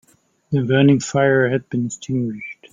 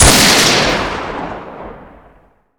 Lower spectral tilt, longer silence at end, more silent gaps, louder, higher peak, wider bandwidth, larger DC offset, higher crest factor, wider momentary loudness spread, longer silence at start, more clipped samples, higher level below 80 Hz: first, -6 dB/octave vs -2 dB/octave; second, 0.2 s vs 0.75 s; neither; second, -18 LUFS vs -10 LUFS; about the same, -2 dBFS vs 0 dBFS; second, 9.4 kHz vs over 20 kHz; neither; about the same, 16 dB vs 14 dB; second, 10 LU vs 24 LU; first, 0.5 s vs 0 s; second, under 0.1% vs 0.3%; second, -58 dBFS vs -26 dBFS